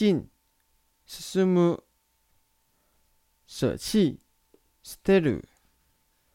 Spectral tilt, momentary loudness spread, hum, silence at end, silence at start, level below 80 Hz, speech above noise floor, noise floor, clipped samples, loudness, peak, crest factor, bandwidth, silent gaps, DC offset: -6.5 dB/octave; 21 LU; none; 0.95 s; 0 s; -56 dBFS; 45 dB; -70 dBFS; under 0.1%; -26 LUFS; -8 dBFS; 20 dB; 16.5 kHz; none; under 0.1%